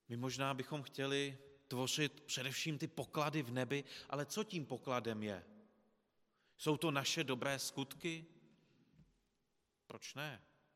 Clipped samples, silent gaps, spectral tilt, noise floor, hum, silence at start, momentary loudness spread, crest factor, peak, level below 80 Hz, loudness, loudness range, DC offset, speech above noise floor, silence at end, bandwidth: under 0.1%; none; -4 dB/octave; -84 dBFS; none; 0.1 s; 10 LU; 22 dB; -22 dBFS; -82 dBFS; -41 LUFS; 4 LU; under 0.1%; 42 dB; 0.35 s; 16 kHz